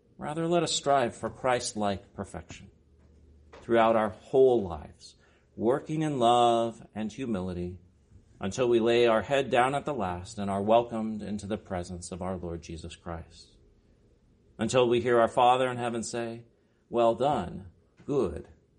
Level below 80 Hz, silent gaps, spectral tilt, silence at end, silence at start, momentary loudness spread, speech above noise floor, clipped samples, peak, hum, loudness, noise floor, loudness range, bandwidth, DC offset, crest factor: -56 dBFS; none; -5 dB/octave; 0.35 s; 0.2 s; 17 LU; 35 dB; under 0.1%; -8 dBFS; none; -28 LUFS; -63 dBFS; 5 LU; 10.5 kHz; under 0.1%; 20 dB